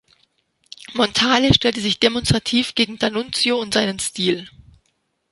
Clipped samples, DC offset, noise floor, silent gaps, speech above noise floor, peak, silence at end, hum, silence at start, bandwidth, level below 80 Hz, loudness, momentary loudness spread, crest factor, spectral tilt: under 0.1%; under 0.1%; -69 dBFS; none; 50 dB; 0 dBFS; 0.85 s; none; 0.9 s; 11.5 kHz; -42 dBFS; -18 LUFS; 7 LU; 20 dB; -4 dB/octave